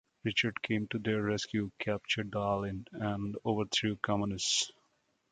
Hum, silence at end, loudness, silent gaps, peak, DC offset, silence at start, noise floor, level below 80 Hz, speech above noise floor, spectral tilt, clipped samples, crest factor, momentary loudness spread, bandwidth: none; 0.6 s; -33 LUFS; none; -16 dBFS; under 0.1%; 0.25 s; -75 dBFS; -60 dBFS; 41 dB; -4 dB/octave; under 0.1%; 18 dB; 6 LU; 9.6 kHz